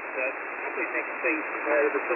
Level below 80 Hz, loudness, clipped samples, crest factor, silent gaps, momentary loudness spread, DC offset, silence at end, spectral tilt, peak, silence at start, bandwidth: -76 dBFS; -28 LUFS; under 0.1%; 16 dB; none; 6 LU; under 0.1%; 0 s; -7 dB/octave; -12 dBFS; 0 s; 3.1 kHz